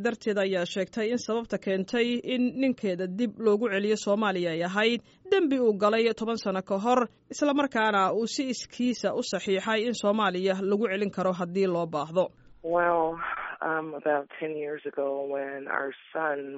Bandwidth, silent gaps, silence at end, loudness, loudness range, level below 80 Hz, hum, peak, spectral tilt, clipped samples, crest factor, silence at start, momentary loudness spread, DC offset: 8 kHz; none; 0 s; -28 LUFS; 4 LU; -68 dBFS; none; -10 dBFS; -3.5 dB/octave; under 0.1%; 16 dB; 0 s; 7 LU; under 0.1%